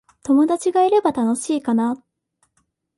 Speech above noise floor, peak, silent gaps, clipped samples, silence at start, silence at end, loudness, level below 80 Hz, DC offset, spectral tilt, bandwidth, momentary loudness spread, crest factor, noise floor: 51 dB; -6 dBFS; none; under 0.1%; 0.25 s; 1 s; -19 LUFS; -64 dBFS; under 0.1%; -5 dB/octave; 11.5 kHz; 6 LU; 14 dB; -69 dBFS